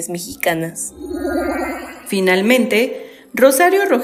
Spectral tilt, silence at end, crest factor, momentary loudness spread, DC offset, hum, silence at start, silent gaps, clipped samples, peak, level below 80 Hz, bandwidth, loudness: -4 dB/octave; 0 s; 16 dB; 13 LU; under 0.1%; none; 0 s; none; under 0.1%; 0 dBFS; -46 dBFS; 16 kHz; -16 LUFS